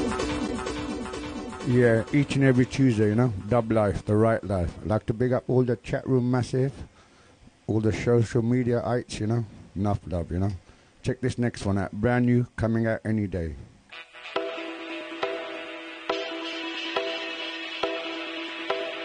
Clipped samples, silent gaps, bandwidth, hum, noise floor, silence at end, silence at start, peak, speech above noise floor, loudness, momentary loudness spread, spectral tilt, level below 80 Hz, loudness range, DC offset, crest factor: under 0.1%; none; 10 kHz; none; -55 dBFS; 0 s; 0 s; -8 dBFS; 31 dB; -27 LUFS; 13 LU; -7 dB/octave; -48 dBFS; 8 LU; under 0.1%; 18 dB